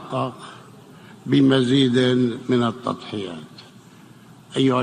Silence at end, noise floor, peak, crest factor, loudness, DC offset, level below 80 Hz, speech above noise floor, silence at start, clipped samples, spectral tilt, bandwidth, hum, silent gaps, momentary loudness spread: 0 s; -47 dBFS; -4 dBFS; 18 dB; -20 LUFS; under 0.1%; -62 dBFS; 27 dB; 0 s; under 0.1%; -6.5 dB/octave; 10 kHz; none; none; 21 LU